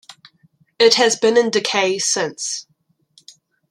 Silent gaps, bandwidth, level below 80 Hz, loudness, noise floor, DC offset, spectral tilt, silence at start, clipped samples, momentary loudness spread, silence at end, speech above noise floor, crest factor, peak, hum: none; 13 kHz; -70 dBFS; -16 LUFS; -64 dBFS; under 0.1%; -1.5 dB/octave; 0.1 s; under 0.1%; 12 LU; 1.1 s; 48 dB; 20 dB; 0 dBFS; none